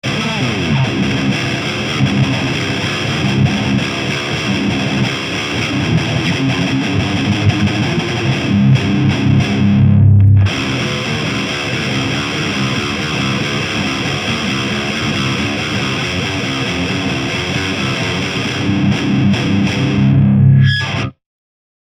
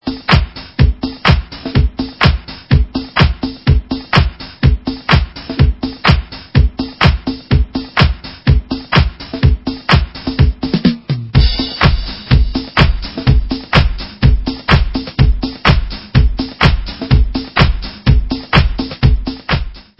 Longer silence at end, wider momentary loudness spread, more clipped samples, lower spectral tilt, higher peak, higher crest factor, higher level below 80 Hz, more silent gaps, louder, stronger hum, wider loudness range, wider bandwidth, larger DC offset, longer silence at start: first, 0.7 s vs 0.2 s; about the same, 6 LU vs 5 LU; second, under 0.1% vs 0.2%; second, -5.5 dB/octave vs -7.5 dB/octave; about the same, 0 dBFS vs 0 dBFS; about the same, 14 dB vs 14 dB; second, -38 dBFS vs -16 dBFS; neither; about the same, -15 LUFS vs -14 LUFS; neither; first, 4 LU vs 1 LU; first, 11 kHz vs 8 kHz; second, under 0.1% vs 0.3%; about the same, 0.05 s vs 0.05 s